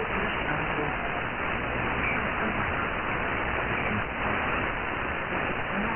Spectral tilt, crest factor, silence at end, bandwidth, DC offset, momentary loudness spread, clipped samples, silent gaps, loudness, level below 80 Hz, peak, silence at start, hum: -1 dB/octave; 14 dB; 0 s; 3.4 kHz; under 0.1%; 3 LU; under 0.1%; none; -28 LUFS; -42 dBFS; -14 dBFS; 0 s; none